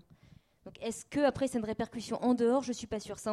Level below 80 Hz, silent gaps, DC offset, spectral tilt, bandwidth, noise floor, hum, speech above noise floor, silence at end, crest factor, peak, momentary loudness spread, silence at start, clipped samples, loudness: -62 dBFS; none; under 0.1%; -5 dB/octave; 13 kHz; -61 dBFS; none; 29 dB; 0 s; 18 dB; -16 dBFS; 11 LU; 0.65 s; under 0.1%; -33 LUFS